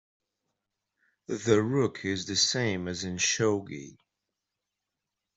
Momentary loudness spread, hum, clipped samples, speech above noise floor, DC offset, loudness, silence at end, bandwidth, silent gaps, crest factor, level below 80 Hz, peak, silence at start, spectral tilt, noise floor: 10 LU; none; under 0.1%; 58 dB; under 0.1%; -28 LUFS; 1.45 s; 8.2 kHz; none; 22 dB; -68 dBFS; -10 dBFS; 1.3 s; -3.5 dB/octave; -86 dBFS